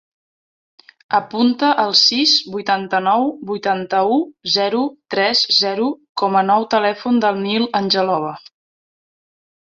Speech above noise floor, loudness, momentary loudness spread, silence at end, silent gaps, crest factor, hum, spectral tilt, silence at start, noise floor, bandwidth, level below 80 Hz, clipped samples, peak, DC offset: over 73 dB; -16 LUFS; 9 LU; 1.35 s; 6.09-6.15 s; 18 dB; none; -3.5 dB/octave; 1.1 s; under -90 dBFS; 7.6 kHz; -64 dBFS; under 0.1%; -2 dBFS; under 0.1%